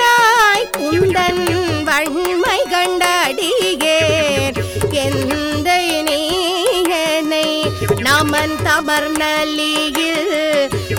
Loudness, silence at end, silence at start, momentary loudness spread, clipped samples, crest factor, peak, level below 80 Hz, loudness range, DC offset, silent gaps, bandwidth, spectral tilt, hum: -15 LUFS; 0 s; 0 s; 4 LU; under 0.1%; 14 dB; 0 dBFS; -40 dBFS; 1 LU; under 0.1%; none; over 20 kHz; -3.5 dB/octave; none